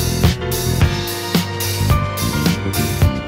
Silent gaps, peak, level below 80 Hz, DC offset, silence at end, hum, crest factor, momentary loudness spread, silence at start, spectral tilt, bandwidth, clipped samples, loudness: none; -2 dBFS; -26 dBFS; under 0.1%; 0 s; none; 16 dB; 3 LU; 0 s; -5 dB/octave; 16.5 kHz; under 0.1%; -18 LUFS